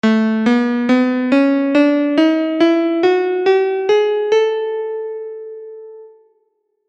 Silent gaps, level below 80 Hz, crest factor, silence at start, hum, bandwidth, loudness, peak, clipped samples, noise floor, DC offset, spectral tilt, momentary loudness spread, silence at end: none; -68 dBFS; 12 dB; 0.05 s; none; 8.4 kHz; -15 LUFS; -2 dBFS; under 0.1%; -65 dBFS; under 0.1%; -6 dB/octave; 15 LU; 0.8 s